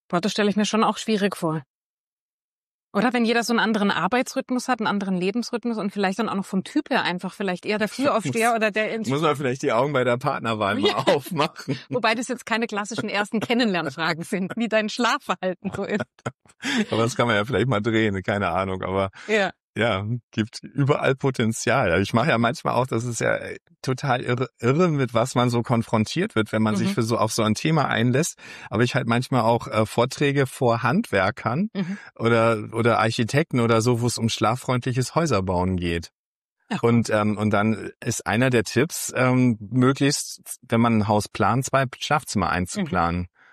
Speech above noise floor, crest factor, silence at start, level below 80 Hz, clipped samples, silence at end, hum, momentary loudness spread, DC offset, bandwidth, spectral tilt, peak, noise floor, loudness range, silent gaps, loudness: over 68 dB; 16 dB; 0.1 s; -56 dBFS; under 0.1%; 0.25 s; none; 7 LU; under 0.1%; 13.5 kHz; -5.5 dB/octave; -6 dBFS; under -90 dBFS; 3 LU; 1.66-2.89 s, 16.34-16.38 s, 19.60-19.74 s, 20.23-20.30 s, 23.62-23.66 s, 36.15-36.56 s; -23 LUFS